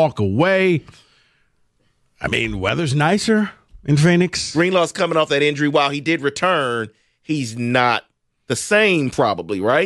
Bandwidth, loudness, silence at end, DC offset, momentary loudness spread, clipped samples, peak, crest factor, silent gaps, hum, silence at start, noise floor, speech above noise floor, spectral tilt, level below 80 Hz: 12.5 kHz; -18 LUFS; 0 s; under 0.1%; 9 LU; under 0.1%; -4 dBFS; 14 dB; none; none; 0 s; -63 dBFS; 45 dB; -5 dB/octave; -48 dBFS